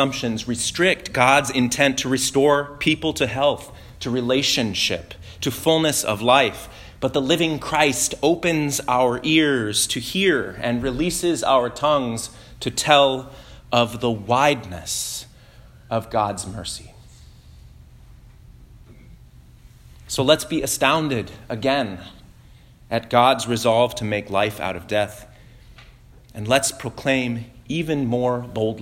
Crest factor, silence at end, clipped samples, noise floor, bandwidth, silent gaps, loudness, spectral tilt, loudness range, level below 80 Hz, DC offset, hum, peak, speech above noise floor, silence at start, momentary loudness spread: 22 dB; 0 s; under 0.1%; -48 dBFS; 16.5 kHz; none; -20 LUFS; -3.5 dB/octave; 7 LU; -48 dBFS; under 0.1%; none; 0 dBFS; 27 dB; 0 s; 12 LU